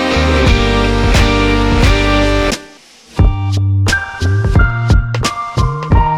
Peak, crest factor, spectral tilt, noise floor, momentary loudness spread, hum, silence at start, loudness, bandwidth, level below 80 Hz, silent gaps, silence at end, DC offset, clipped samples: 0 dBFS; 12 dB; -5.5 dB/octave; -40 dBFS; 6 LU; none; 0 s; -13 LUFS; 13.5 kHz; -16 dBFS; none; 0 s; under 0.1%; under 0.1%